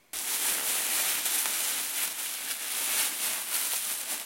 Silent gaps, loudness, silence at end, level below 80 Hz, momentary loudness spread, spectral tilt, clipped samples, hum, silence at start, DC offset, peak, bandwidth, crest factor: none; -27 LUFS; 0 s; -76 dBFS; 5 LU; 2.5 dB/octave; under 0.1%; none; 0.15 s; under 0.1%; -8 dBFS; 16.5 kHz; 22 dB